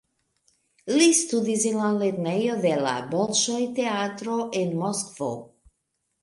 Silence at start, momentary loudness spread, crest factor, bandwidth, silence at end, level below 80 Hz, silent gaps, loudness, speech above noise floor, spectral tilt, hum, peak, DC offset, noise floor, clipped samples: 0.85 s; 10 LU; 18 dB; 11.5 kHz; 0.8 s; -70 dBFS; none; -24 LUFS; 53 dB; -3.5 dB/octave; none; -6 dBFS; under 0.1%; -77 dBFS; under 0.1%